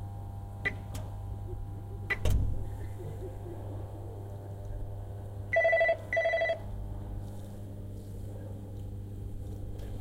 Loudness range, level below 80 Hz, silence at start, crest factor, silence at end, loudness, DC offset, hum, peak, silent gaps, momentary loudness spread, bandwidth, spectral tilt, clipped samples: 9 LU; -42 dBFS; 0 s; 20 dB; 0 s; -35 LUFS; under 0.1%; none; -16 dBFS; none; 15 LU; 16 kHz; -6.5 dB/octave; under 0.1%